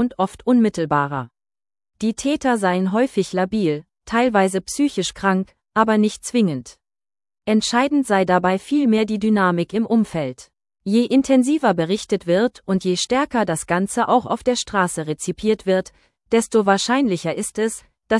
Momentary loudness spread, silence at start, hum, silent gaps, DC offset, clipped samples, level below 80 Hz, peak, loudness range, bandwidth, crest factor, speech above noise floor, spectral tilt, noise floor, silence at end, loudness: 7 LU; 0 s; none; none; under 0.1%; under 0.1%; -54 dBFS; -2 dBFS; 2 LU; 12 kHz; 18 dB; over 71 dB; -5 dB/octave; under -90 dBFS; 0 s; -20 LUFS